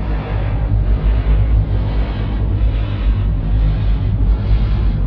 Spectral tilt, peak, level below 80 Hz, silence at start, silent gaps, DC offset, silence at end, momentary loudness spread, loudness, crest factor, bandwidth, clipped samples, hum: -10.5 dB/octave; -4 dBFS; -16 dBFS; 0 s; none; under 0.1%; 0 s; 4 LU; -18 LUFS; 10 dB; 4.7 kHz; under 0.1%; none